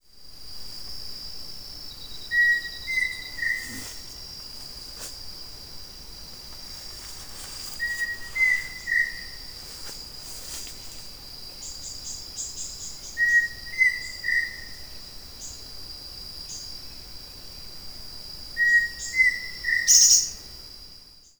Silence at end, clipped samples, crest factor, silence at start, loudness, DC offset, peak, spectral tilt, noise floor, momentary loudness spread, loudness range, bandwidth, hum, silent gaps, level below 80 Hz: 0.1 s; under 0.1%; 26 dB; 0.15 s; -23 LUFS; under 0.1%; -2 dBFS; 1.5 dB/octave; -49 dBFS; 20 LU; 17 LU; over 20 kHz; none; none; -50 dBFS